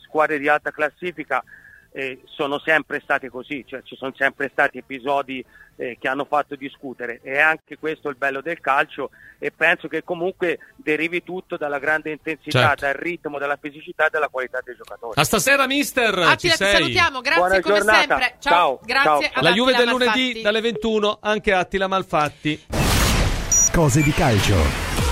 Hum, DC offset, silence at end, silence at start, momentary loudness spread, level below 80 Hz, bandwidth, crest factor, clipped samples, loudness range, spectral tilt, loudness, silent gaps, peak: none; under 0.1%; 0 s; 0.15 s; 15 LU; -36 dBFS; 16 kHz; 20 dB; under 0.1%; 8 LU; -3.5 dB/octave; -20 LUFS; none; 0 dBFS